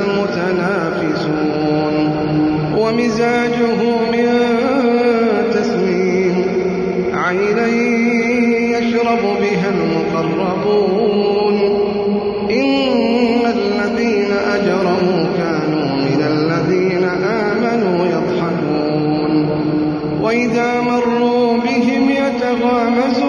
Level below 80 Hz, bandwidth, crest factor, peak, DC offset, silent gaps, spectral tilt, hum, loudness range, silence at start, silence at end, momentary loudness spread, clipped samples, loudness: -48 dBFS; 10 kHz; 12 dB; -4 dBFS; under 0.1%; none; -6.5 dB/octave; none; 1 LU; 0 s; 0 s; 3 LU; under 0.1%; -15 LUFS